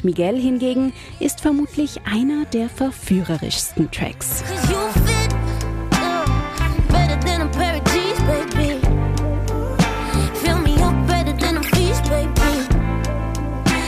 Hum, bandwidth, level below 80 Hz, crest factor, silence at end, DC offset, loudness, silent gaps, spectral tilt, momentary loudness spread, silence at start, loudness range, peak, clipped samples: none; 15.5 kHz; -24 dBFS; 12 dB; 0 s; under 0.1%; -20 LUFS; none; -5.5 dB/octave; 5 LU; 0 s; 2 LU; -6 dBFS; under 0.1%